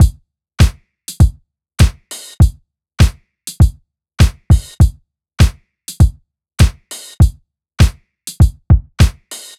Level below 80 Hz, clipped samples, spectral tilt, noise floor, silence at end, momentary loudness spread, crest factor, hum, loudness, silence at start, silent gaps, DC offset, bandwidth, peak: -18 dBFS; under 0.1%; -5.5 dB/octave; -40 dBFS; 0.2 s; 16 LU; 14 dB; none; -14 LUFS; 0 s; none; under 0.1%; 15 kHz; 0 dBFS